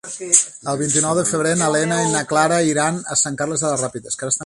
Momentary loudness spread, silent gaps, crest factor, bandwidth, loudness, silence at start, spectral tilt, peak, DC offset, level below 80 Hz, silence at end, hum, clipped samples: 8 LU; none; 20 dB; 11.5 kHz; -18 LUFS; 0.05 s; -3 dB/octave; 0 dBFS; under 0.1%; -58 dBFS; 0 s; none; under 0.1%